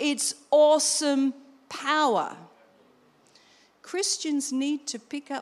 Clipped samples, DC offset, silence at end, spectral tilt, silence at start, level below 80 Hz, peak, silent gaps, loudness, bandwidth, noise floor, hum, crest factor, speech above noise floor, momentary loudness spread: under 0.1%; under 0.1%; 0 s; -1.5 dB/octave; 0 s; -84 dBFS; -10 dBFS; none; -25 LUFS; 15 kHz; -60 dBFS; none; 16 dB; 35 dB; 15 LU